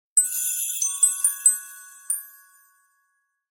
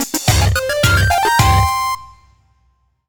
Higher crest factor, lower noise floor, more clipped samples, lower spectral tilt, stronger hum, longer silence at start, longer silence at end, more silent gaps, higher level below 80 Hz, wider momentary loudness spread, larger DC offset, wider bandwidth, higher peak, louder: first, 22 dB vs 14 dB; first, -72 dBFS vs -60 dBFS; neither; second, 6 dB/octave vs -4 dB/octave; neither; first, 0.15 s vs 0 s; first, 1.2 s vs 1 s; neither; second, -82 dBFS vs -26 dBFS; first, 11 LU vs 7 LU; neither; second, 16.5 kHz vs over 20 kHz; second, -4 dBFS vs 0 dBFS; second, -21 LUFS vs -14 LUFS